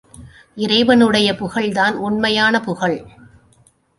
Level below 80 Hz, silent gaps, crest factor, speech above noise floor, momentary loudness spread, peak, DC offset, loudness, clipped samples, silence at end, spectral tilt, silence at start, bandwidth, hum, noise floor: -50 dBFS; none; 16 dB; 39 dB; 9 LU; -2 dBFS; under 0.1%; -16 LUFS; under 0.1%; 0.9 s; -4.5 dB/octave; 0.2 s; 11.5 kHz; none; -55 dBFS